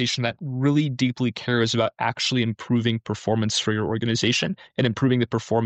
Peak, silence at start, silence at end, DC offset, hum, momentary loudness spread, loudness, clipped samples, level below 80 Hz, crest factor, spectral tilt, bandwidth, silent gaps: -8 dBFS; 0 s; 0 s; under 0.1%; none; 4 LU; -23 LUFS; under 0.1%; -58 dBFS; 14 dB; -5 dB/octave; 8.8 kHz; none